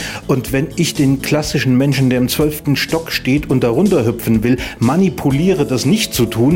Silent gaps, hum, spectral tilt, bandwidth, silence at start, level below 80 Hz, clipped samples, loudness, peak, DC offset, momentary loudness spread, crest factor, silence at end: none; none; -5.5 dB/octave; 16.5 kHz; 0 s; -36 dBFS; under 0.1%; -15 LUFS; -2 dBFS; 0.1%; 4 LU; 12 dB; 0 s